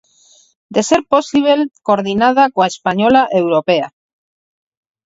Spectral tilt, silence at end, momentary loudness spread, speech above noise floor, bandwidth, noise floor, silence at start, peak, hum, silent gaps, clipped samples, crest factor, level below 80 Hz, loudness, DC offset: -4.5 dB/octave; 1.15 s; 5 LU; 37 dB; 8 kHz; -50 dBFS; 0.7 s; 0 dBFS; none; none; under 0.1%; 16 dB; -54 dBFS; -14 LUFS; under 0.1%